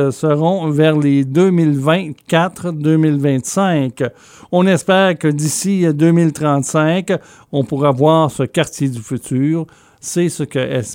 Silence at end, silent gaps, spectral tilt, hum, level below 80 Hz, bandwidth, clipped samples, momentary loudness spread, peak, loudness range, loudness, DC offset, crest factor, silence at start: 0 s; none; -6 dB/octave; none; -56 dBFS; 16.5 kHz; under 0.1%; 9 LU; -2 dBFS; 2 LU; -15 LUFS; under 0.1%; 14 dB; 0 s